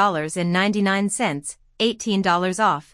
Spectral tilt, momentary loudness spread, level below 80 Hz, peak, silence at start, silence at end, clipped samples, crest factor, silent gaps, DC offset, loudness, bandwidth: -4.5 dB/octave; 5 LU; -58 dBFS; -6 dBFS; 0 s; 0.1 s; under 0.1%; 16 dB; none; under 0.1%; -21 LUFS; 12 kHz